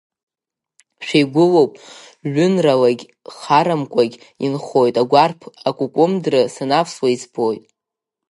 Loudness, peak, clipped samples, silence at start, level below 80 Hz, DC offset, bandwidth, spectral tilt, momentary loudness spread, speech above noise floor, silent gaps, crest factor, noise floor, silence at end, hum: -17 LUFS; 0 dBFS; under 0.1%; 1 s; -68 dBFS; under 0.1%; 11.5 kHz; -6 dB/octave; 11 LU; 70 dB; none; 18 dB; -87 dBFS; 0.7 s; none